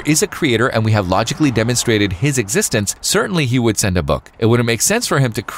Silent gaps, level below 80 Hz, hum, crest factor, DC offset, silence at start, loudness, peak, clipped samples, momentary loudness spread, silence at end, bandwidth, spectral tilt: none; -38 dBFS; none; 14 dB; under 0.1%; 0 s; -16 LUFS; -2 dBFS; under 0.1%; 3 LU; 0 s; 16.5 kHz; -4.5 dB/octave